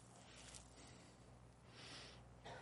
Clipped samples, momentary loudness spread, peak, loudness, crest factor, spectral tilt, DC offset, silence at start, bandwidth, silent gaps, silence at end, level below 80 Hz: under 0.1%; 9 LU; -34 dBFS; -60 LUFS; 26 dB; -3 dB/octave; under 0.1%; 0 s; 11.5 kHz; none; 0 s; -70 dBFS